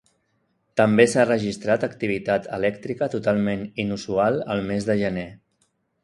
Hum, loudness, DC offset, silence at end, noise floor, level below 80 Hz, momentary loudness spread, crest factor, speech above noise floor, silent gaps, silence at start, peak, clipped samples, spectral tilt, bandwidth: none; -23 LUFS; under 0.1%; 0.65 s; -70 dBFS; -56 dBFS; 10 LU; 22 dB; 48 dB; none; 0.75 s; 0 dBFS; under 0.1%; -6 dB/octave; 11.5 kHz